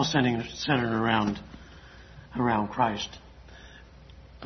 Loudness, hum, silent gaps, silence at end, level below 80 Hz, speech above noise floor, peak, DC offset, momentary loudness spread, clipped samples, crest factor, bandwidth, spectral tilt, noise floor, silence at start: -28 LUFS; none; none; 0 s; -52 dBFS; 23 dB; -8 dBFS; under 0.1%; 24 LU; under 0.1%; 22 dB; 6.4 kHz; -5 dB/octave; -49 dBFS; 0 s